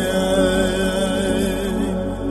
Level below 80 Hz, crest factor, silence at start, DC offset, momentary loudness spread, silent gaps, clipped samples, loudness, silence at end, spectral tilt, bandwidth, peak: -32 dBFS; 14 dB; 0 s; under 0.1%; 5 LU; none; under 0.1%; -20 LUFS; 0 s; -5 dB/octave; 13 kHz; -6 dBFS